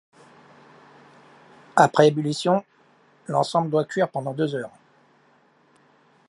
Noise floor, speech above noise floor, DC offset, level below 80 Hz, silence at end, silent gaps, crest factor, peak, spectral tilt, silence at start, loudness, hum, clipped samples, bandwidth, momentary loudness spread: -60 dBFS; 38 dB; under 0.1%; -74 dBFS; 1.6 s; none; 24 dB; -2 dBFS; -5.5 dB/octave; 1.75 s; -22 LUFS; none; under 0.1%; 11.5 kHz; 10 LU